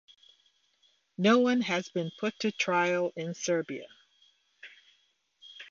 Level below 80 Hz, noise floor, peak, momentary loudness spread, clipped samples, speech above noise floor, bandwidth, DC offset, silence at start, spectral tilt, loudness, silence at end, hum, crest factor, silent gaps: -80 dBFS; -71 dBFS; -12 dBFS; 25 LU; under 0.1%; 43 dB; 7.4 kHz; under 0.1%; 1.2 s; -4.5 dB/octave; -29 LUFS; 0.05 s; none; 20 dB; none